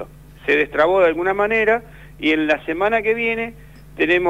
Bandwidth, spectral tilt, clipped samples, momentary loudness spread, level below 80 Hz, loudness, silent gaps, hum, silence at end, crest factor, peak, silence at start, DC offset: 15.5 kHz; -6 dB/octave; under 0.1%; 8 LU; -46 dBFS; -18 LUFS; none; none; 0 s; 14 dB; -4 dBFS; 0 s; 0.2%